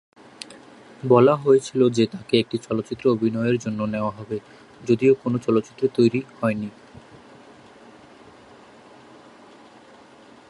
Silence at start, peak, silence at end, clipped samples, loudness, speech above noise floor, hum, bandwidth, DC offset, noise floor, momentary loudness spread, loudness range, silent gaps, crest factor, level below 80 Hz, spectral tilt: 0.5 s; -2 dBFS; 3.8 s; under 0.1%; -21 LUFS; 28 dB; none; 11.5 kHz; under 0.1%; -48 dBFS; 17 LU; 8 LU; none; 20 dB; -62 dBFS; -7 dB/octave